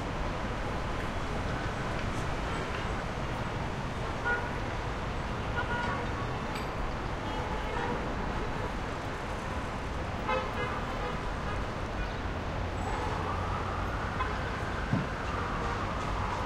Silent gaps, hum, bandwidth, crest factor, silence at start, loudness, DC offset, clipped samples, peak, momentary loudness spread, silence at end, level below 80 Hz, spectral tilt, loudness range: none; none; 13.5 kHz; 18 dB; 0 s; -34 LUFS; under 0.1%; under 0.1%; -16 dBFS; 3 LU; 0 s; -40 dBFS; -6 dB/octave; 1 LU